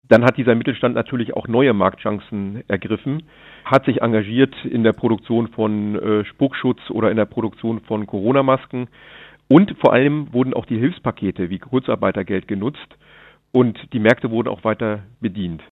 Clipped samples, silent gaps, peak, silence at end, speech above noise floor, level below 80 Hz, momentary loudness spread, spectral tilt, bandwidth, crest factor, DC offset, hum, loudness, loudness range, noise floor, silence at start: under 0.1%; none; 0 dBFS; 0.1 s; 30 dB; -56 dBFS; 11 LU; -8.5 dB/octave; 7 kHz; 18 dB; under 0.1%; none; -19 LUFS; 3 LU; -48 dBFS; 0.1 s